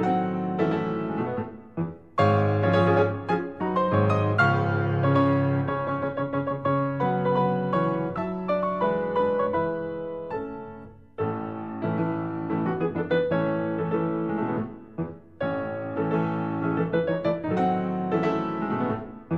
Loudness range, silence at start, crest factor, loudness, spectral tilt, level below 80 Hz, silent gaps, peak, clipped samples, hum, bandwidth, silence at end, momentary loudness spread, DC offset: 5 LU; 0 s; 16 dB; -26 LUFS; -9 dB/octave; -60 dBFS; none; -8 dBFS; under 0.1%; none; 7.4 kHz; 0 s; 11 LU; 0.2%